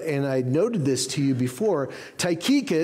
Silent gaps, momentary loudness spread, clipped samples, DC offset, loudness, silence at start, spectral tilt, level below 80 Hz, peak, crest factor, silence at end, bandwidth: none; 5 LU; under 0.1%; under 0.1%; -24 LUFS; 0 s; -5 dB/octave; -66 dBFS; -12 dBFS; 12 dB; 0 s; 16 kHz